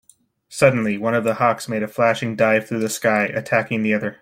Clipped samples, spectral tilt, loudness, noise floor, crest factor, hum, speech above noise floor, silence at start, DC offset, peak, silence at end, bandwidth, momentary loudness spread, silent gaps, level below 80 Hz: under 0.1%; -5.5 dB/octave; -19 LUFS; -53 dBFS; 18 dB; none; 34 dB; 0.5 s; under 0.1%; -2 dBFS; 0.1 s; 16.5 kHz; 5 LU; none; -62 dBFS